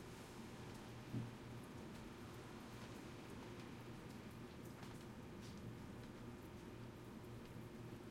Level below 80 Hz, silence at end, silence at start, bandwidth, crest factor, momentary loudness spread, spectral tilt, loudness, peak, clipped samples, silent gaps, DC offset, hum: -68 dBFS; 0 s; 0 s; 16 kHz; 18 dB; 3 LU; -6 dB/octave; -55 LUFS; -36 dBFS; under 0.1%; none; under 0.1%; none